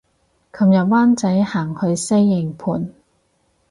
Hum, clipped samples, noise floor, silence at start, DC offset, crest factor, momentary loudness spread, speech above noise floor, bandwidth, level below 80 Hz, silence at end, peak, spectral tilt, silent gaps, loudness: none; under 0.1%; -63 dBFS; 0.55 s; under 0.1%; 12 dB; 10 LU; 47 dB; 11.5 kHz; -56 dBFS; 0.8 s; -6 dBFS; -6.5 dB/octave; none; -17 LUFS